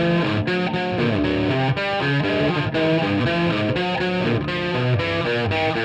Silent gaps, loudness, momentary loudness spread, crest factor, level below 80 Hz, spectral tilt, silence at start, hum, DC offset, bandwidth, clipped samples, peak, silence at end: none; -21 LUFS; 2 LU; 12 dB; -44 dBFS; -7 dB/octave; 0 s; none; under 0.1%; 8.8 kHz; under 0.1%; -8 dBFS; 0 s